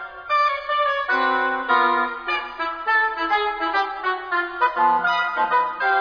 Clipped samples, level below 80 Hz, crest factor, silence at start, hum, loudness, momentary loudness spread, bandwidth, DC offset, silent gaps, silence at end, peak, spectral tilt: under 0.1%; -58 dBFS; 16 dB; 0 s; none; -21 LUFS; 6 LU; 5.4 kHz; under 0.1%; none; 0 s; -4 dBFS; -3.5 dB/octave